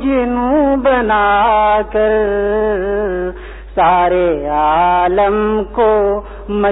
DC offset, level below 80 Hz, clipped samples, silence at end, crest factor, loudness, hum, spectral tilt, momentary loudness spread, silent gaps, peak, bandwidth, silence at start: 0.2%; -32 dBFS; under 0.1%; 0 s; 12 dB; -14 LUFS; none; -10 dB/octave; 7 LU; none; -2 dBFS; 4 kHz; 0 s